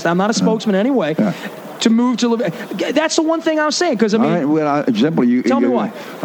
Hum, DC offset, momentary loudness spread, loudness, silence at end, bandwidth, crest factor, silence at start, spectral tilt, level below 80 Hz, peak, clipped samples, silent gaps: none; under 0.1%; 5 LU; -16 LUFS; 0 s; 19 kHz; 14 dB; 0 s; -5 dB/octave; -68 dBFS; -2 dBFS; under 0.1%; none